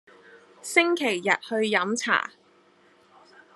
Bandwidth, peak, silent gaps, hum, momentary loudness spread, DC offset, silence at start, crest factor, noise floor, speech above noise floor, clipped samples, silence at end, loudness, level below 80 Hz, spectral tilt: 13 kHz; -4 dBFS; none; none; 5 LU; under 0.1%; 0.35 s; 24 dB; -59 dBFS; 35 dB; under 0.1%; 1.25 s; -24 LUFS; -84 dBFS; -3 dB/octave